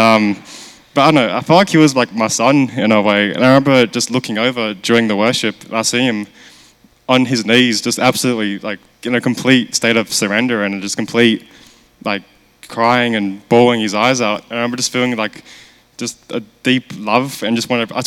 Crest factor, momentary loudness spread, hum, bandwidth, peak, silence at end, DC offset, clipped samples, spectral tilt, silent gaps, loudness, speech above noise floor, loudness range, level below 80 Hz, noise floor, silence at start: 14 dB; 12 LU; none; 16 kHz; 0 dBFS; 0 s; under 0.1%; under 0.1%; -4 dB/octave; none; -14 LUFS; 34 dB; 5 LU; -60 dBFS; -48 dBFS; 0 s